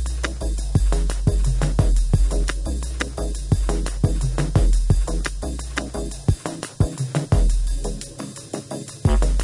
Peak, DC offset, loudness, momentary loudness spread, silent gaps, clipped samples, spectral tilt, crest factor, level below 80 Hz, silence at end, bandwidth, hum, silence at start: -6 dBFS; under 0.1%; -24 LUFS; 10 LU; none; under 0.1%; -5.5 dB/octave; 14 dB; -22 dBFS; 0 s; 11.5 kHz; none; 0 s